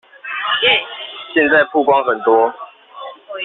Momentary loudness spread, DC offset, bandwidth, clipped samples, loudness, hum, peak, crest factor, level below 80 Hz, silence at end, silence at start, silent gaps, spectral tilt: 21 LU; under 0.1%; 4.2 kHz; under 0.1%; -14 LUFS; none; -2 dBFS; 16 dB; -62 dBFS; 0 s; 0.25 s; none; 0.5 dB/octave